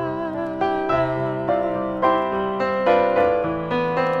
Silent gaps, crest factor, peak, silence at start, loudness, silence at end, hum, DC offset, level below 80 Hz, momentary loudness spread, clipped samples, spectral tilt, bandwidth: none; 16 dB; -6 dBFS; 0 s; -21 LUFS; 0 s; none; under 0.1%; -50 dBFS; 6 LU; under 0.1%; -8 dB/octave; 7.2 kHz